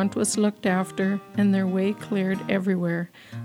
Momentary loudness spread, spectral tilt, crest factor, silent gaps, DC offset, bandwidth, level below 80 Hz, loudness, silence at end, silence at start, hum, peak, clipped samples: 4 LU; -5.5 dB/octave; 16 dB; none; under 0.1%; 14.5 kHz; -68 dBFS; -24 LUFS; 0 s; 0 s; none; -8 dBFS; under 0.1%